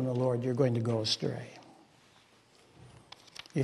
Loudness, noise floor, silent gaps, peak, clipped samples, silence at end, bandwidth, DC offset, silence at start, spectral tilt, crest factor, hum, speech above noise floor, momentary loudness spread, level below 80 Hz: -31 LUFS; -63 dBFS; none; -14 dBFS; under 0.1%; 0 s; 12 kHz; under 0.1%; 0 s; -6 dB/octave; 20 dB; none; 32 dB; 23 LU; -72 dBFS